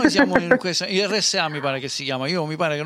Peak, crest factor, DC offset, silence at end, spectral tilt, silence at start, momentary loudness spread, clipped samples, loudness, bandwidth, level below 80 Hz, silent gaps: -4 dBFS; 18 dB; under 0.1%; 0 s; -3.5 dB/octave; 0 s; 7 LU; under 0.1%; -21 LUFS; 15 kHz; -56 dBFS; none